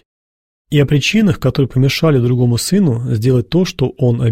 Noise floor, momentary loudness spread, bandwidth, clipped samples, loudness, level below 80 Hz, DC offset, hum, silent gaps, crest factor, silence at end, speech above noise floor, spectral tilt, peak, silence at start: under -90 dBFS; 4 LU; 16 kHz; under 0.1%; -14 LUFS; -40 dBFS; 0.4%; none; none; 12 dB; 0 s; over 77 dB; -6.5 dB/octave; -2 dBFS; 0.7 s